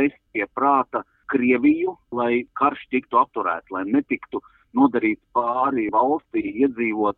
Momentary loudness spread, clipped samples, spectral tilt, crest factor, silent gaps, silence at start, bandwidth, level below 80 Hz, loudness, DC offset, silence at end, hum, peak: 9 LU; under 0.1%; -9 dB/octave; 18 dB; none; 0 s; 4.1 kHz; -62 dBFS; -22 LUFS; under 0.1%; 0.05 s; none; -4 dBFS